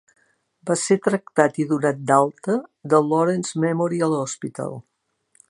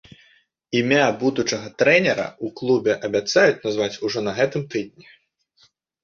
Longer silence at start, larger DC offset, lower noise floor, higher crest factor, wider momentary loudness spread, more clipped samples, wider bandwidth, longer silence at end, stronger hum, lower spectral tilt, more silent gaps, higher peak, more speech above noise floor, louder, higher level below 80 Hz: about the same, 0.65 s vs 0.7 s; neither; first, -65 dBFS vs -61 dBFS; about the same, 22 dB vs 20 dB; about the same, 11 LU vs 11 LU; neither; first, 11.5 kHz vs 7.6 kHz; second, 0.7 s vs 1.15 s; neither; about the same, -5.5 dB/octave vs -4.5 dB/octave; neither; about the same, 0 dBFS vs -2 dBFS; first, 44 dB vs 40 dB; about the same, -21 LUFS vs -21 LUFS; second, -72 dBFS vs -62 dBFS